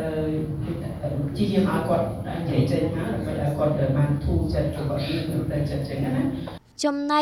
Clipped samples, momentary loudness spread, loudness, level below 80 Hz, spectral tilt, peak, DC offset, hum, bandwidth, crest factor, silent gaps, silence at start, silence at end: under 0.1%; 7 LU; -25 LUFS; -38 dBFS; -7.5 dB/octave; -8 dBFS; under 0.1%; none; 14 kHz; 16 dB; none; 0 s; 0 s